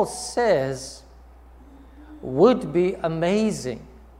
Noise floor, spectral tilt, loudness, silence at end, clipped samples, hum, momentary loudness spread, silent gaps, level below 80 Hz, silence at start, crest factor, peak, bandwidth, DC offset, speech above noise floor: -47 dBFS; -5.5 dB/octave; -22 LUFS; 0.2 s; under 0.1%; none; 20 LU; none; -48 dBFS; 0 s; 20 dB; -4 dBFS; 15 kHz; under 0.1%; 25 dB